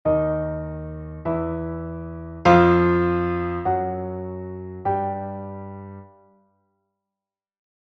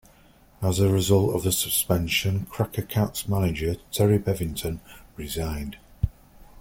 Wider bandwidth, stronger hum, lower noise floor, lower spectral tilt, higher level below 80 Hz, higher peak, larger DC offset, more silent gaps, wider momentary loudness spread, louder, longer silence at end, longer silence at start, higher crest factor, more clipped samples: second, 6.2 kHz vs 17 kHz; neither; first, -89 dBFS vs -55 dBFS; first, -8.5 dB/octave vs -5 dB/octave; about the same, -44 dBFS vs -42 dBFS; first, -2 dBFS vs -8 dBFS; neither; neither; first, 18 LU vs 12 LU; about the same, -23 LUFS vs -25 LUFS; first, 1.75 s vs 0 s; second, 0.05 s vs 0.6 s; about the same, 22 dB vs 18 dB; neither